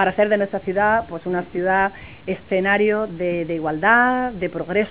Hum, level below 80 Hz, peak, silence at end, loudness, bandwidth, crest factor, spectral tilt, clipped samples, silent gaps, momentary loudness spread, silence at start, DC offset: none; -48 dBFS; -2 dBFS; 0 s; -20 LUFS; 4 kHz; 18 dB; -9.5 dB/octave; under 0.1%; none; 10 LU; 0 s; 0.4%